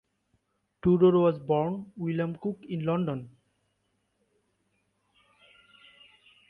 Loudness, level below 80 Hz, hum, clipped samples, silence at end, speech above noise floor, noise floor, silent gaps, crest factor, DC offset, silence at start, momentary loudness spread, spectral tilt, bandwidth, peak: -27 LUFS; -62 dBFS; none; under 0.1%; 3.2 s; 49 dB; -76 dBFS; none; 20 dB; under 0.1%; 0.85 s; 13 LU; -10.5 dB/octave; 3.8 kHz; -10 dBFS